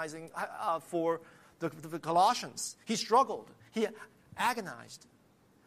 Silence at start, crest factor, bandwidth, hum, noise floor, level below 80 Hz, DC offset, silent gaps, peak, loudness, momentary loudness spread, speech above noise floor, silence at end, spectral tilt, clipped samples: 0 s; 20 dB; 15 kHz; none; -65 dBFS; -78 dBFS; under 0.1%; none; -14 dBFS; -33 LUFS; 18 LU; 32 dB; 0.7 s; -3.5 dB/octave; under 0.1%